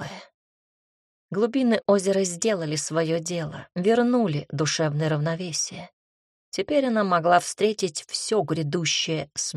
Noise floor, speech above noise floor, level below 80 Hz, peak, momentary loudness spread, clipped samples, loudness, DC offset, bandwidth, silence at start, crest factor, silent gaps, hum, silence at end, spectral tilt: under -90 dBFS; over 66 dB; -66 dBFS; -6 dBFS; 10 LU; under 0.1%; -24 LUFS; under 0.1%; 13 kHz; 0 s; 18 dB; 0.34-1.29 s, 5.93-6.52 s; none; 0 s; -4.5 dB/octave